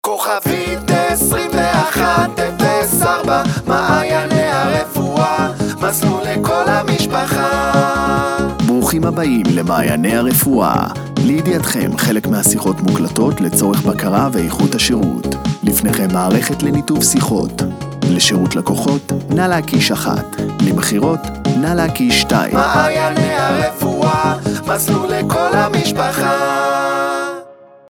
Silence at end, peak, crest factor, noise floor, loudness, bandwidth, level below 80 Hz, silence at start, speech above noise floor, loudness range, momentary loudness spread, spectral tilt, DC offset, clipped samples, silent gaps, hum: 0.35 s; 0 dBFS; 14 dB; -38 dBFS; -15 LUFS; over 20 kHz; -38 dBFS; 0.05 s; 24 dB; 1 LU; 5 LU; -4.5 dB/octave; under 0.1%; under 0.1%; none; none